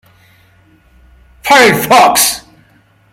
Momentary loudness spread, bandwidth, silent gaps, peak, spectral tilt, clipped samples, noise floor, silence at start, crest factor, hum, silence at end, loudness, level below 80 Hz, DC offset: 15 LU; 18.5 kHz; none; 0 dBFS; -2 dB/octave; under 0.1%; -49 dBFS; 1.45 s; 12 dB; none; 0.75 s; -7 LUFS; -46 dBFS; under 0.1%